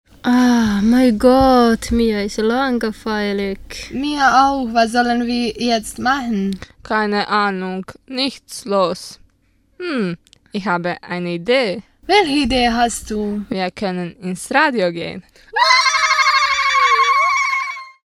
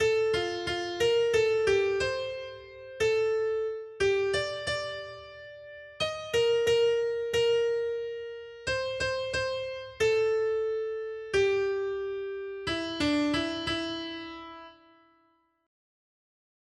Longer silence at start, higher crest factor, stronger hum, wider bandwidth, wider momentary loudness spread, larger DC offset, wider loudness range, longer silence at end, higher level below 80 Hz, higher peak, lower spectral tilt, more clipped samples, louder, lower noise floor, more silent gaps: first, 0.25 s vs 0 s; about the same, 18 dB vs 16 dB; neither; about the same, 13.5 kHz vs 12.5 kHz; about the same, 14 LU vs 15 LU; neither; first, 7 LU vs 4 LU; second, 0.15 s vs 1.95 s; first, -40 dBFS vs -58 dBFS; first, 0 dBFS vs -14 dBFS; about the same, -4 dB/octave vs -4 dB/octave; neither; first, -16 LUFS vs -29 LUFS; second, -59 dBFS vs -69 dBFS; neither